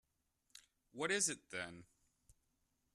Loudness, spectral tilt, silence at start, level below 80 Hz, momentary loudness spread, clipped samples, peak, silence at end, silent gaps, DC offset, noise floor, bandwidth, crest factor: -40 LUFS; -1.5 dB/octave; 0.95 s; -80 dBFS; 22 LU; under 0.1%; -24 dBFS; 1.1 s; none; under 0.1%; -83 dBFS; 13.5 kHz; 22 dB